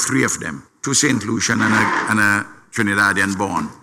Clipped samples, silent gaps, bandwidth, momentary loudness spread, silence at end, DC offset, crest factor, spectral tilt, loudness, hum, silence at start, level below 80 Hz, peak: under 0.1%; none; 16.5 kHz; 8 LU; 0.1 s; under 0.1%; 14 dB; -3 dB/octave; -17 LUFS; none; 0 s; -54 dBFS; -4 dBFS